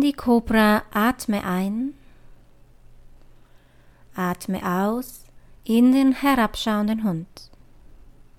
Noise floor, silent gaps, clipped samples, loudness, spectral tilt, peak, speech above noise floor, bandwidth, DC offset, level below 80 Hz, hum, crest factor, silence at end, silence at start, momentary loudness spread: -52 dBFS; none; under 0.1%; -22 LUFS; -5.5 dB/octave; -6 dBFS; 31 dB; 17 kHz; under 0.1%; -46 dBFS; none; 18 dB; 0.45 s; 0 s; 14 LU